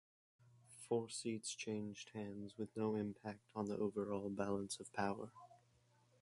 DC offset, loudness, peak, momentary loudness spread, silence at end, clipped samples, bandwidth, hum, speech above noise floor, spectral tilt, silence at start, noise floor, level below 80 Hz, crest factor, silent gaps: under 0.1%; -45 LUFS; -24 dBFS; 9 LU; 0.65 s; under 0.1%; 11.5 kHz; none; 31 dB; -5 dB/octave; 0.55 s; -75 dBFS; -76 dBFS; 20 dB; none